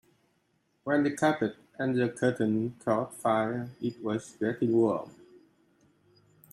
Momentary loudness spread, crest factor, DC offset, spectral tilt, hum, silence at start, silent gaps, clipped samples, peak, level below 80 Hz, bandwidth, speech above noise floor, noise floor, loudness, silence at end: 9 LU; 18 dB; under 0.1%; -6.5 dB/octave; none; 0.85 s; none; under 0.1%; -12 dBFS; -72 dBFS; 14 kHz; 44 dB; -73 dBFS; -29 LUFS; 1.4 s